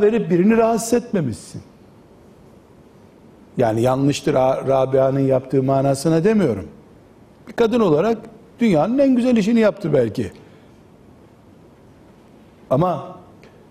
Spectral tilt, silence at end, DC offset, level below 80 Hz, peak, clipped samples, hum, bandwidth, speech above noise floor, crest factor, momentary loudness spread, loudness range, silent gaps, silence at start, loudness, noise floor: -7 dB/octave; 0.5 s; under 0.1%; -52 dBFS; -6 dBFS; under 0.1%; none; 15.5 kHz; 30 dB; 14 dB; 13 LU; 7 LU; none; 0 s; -18 LUFS; -47 dBFS